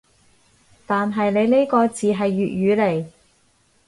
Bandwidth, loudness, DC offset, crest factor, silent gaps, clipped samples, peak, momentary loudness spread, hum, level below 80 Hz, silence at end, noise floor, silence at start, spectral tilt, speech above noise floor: 11.5 kHz; -20 LUFS; under 0.1%; 16 dB; none; under 0.1%; -4 dBFS; 7 LU; none; -60 dBFS; 0.8 s; -60 dBFS; 0.9 s; -6.5 dB/octave; 42 dB